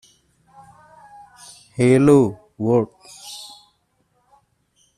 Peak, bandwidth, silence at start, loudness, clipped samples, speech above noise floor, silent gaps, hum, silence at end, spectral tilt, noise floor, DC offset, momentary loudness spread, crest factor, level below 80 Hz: -4 dBFS; 13 kHz; 1.8 s; -17 LUFS; under 0.1%; 50 dB; none; none; 1.5 s; -7 dB/octave; -66 dBFS; under 0.1%; 26 LU; 18 dB; -58 dBFS